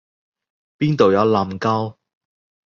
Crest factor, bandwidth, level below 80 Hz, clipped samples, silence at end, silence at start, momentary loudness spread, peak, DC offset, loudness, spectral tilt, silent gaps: 18 dB; 7.2 kHz; -52 dBFS; under 0.1%; 0.75 s; 0.8 s; 9 LU; -2 dBFS; under 0.1%; -18 LUFS; -7.5 dB/octave; none